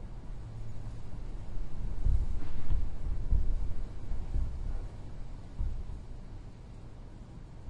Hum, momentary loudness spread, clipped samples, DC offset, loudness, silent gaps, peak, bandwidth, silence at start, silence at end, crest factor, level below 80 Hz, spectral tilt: none; 15 LU; under 0.1%; under 0.1%; -41 LUFS; none; -14 dBFS; 4.8 kHz; 0 s; 0 s; 16 dB; -34 dBFS; -8 dB/octave